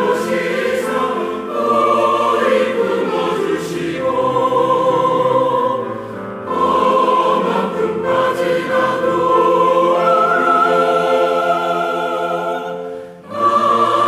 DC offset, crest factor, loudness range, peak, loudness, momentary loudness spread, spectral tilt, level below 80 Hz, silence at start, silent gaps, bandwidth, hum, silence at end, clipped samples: under 0.1%; 12 dB; 3 LU; -4 dBFS; -15 LUFS; 9 LU; -5.5 dB/octave; -62 dBFS; 0 s; none; 15 kHz; none; 0 s; under 0.1%